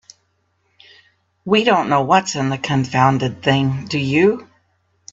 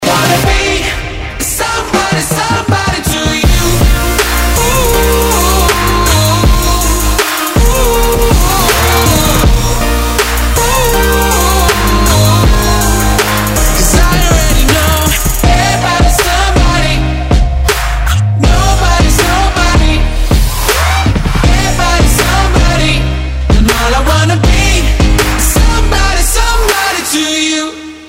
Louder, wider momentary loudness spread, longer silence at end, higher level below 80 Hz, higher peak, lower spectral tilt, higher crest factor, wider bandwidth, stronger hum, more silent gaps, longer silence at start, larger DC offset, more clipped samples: second, -17 LUFS vs -10 LUFS; first, 6 LU vs 3 LU; first, 0.7 s vs 0 s; second, -56 dBFS vs -12 dBFS; about the same, 0 dBFS vs 0 dBFS; first, -5.5 dB/octave vs -4 dB/octave; first, 18 dB vs 8 dB; second, 7.8 kHz vs 16.5 kHz; neither; neither; first, 1.45 s vs 0 s; neither; neither